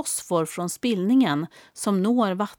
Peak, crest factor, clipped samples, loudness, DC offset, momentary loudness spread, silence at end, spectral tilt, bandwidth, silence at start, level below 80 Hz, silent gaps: -10 dBFS; 14 dB; under 0.1%; -23 LUFS; under 0.1%; 9 LU; 0.05 s; -5 dB/octave; 18 kHz; 0 s; -70 dBFS; none